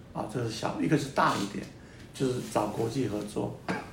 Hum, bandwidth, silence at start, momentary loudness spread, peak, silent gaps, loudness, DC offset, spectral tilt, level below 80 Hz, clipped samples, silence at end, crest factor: none; 16 kHz; 0 s; 12 LU; -10 dBFS; none; -31 LUFS; under 0.1%; -5.5 dB/octave; -58 dBFS; under 0.1%; 0 s; 20 dB